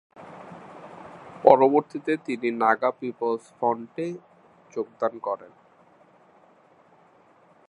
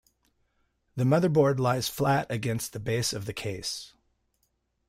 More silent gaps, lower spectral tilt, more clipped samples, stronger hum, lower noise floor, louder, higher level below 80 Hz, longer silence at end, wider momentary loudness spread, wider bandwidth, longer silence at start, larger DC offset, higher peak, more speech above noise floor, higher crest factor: neither; first, -7 dB/octave vs -5.5 dB/octave; neither; neither; second, -57 dBFS vs -75 dBFS; first, -24 LUFS vs -27 LUFS; second, -72 dBFS vs -60 dBFS; first, 2.25 s vs 1 s; first, 25 LU vs 11 LU; second, 10 kHz vs 16 kHz; second, 0.2 s vs 0.95 s; neither; first, 0 dBFS vs -12 dBFS; second, 33 dB vs 48 dB; first, 26 dB vs 18 dB